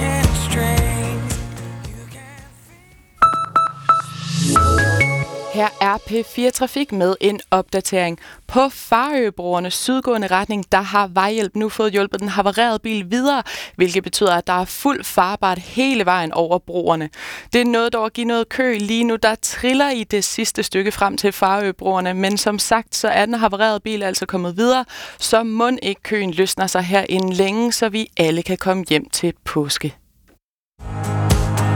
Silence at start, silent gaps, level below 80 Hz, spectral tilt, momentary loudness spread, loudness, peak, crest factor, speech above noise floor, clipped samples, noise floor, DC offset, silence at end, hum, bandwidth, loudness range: 0 s; 30.43-30.72 s; -36 dBFS; -4.5 dB/octave; 6 LU; -18 LUFS; -2 dBFS; 16 dB; 41 dB; under 0.1%; -59 dBFS; under 0.1%; 0 s; none; over 20 kHz; 2 LU